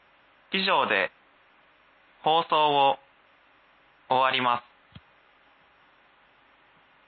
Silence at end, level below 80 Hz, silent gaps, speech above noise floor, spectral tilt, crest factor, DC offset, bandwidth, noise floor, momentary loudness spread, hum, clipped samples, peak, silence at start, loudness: 2.5 s; -74 dBFS; none; 37 dB; -7.5 dB/octave; 20 dB; under 0.1%; 4.8 kHz; -60 dBFS; 9 LU; none; under 0.1%; -10 dBFS; 0.5 s; -25 LUFS